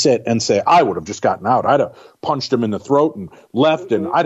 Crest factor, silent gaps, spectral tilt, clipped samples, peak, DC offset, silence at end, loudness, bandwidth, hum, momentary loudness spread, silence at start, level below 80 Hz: 14 dB; none; -5 dB/octave; under 0.1%; -2 dBFS; under 0.1%; 0 s; -17 LUFS; 8.4 kHz; none; 9 LU; 0 s; -58 dBFS